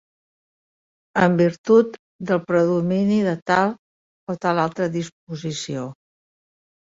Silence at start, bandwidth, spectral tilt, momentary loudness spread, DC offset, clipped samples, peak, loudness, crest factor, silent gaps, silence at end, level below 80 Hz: 1.15 s; 7.8 kHz; -6.5 dB/octave; 15 LU; under 0.1%; under 0.1%; -4 dBFS; -21 LUFS; 18 dB; 1.58-1.64 s, 1.99-2.19 s, 3.42-3.46 s, 3.79-4.27 s, 5.12-5.27 s; 1 s; -62 dBFS